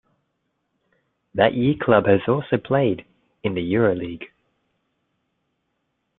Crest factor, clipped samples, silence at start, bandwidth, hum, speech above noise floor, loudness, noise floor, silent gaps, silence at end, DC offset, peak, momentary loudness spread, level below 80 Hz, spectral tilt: 22 dB; under 0.1%; 1.35 s; 4.2 kHz; none; 55 dB; -21 LUFS; -74 dBFS; none; 1.9 s; under 0.1%; -2 dBFS; 14 LU; -58 dBFS; -11 dB/octave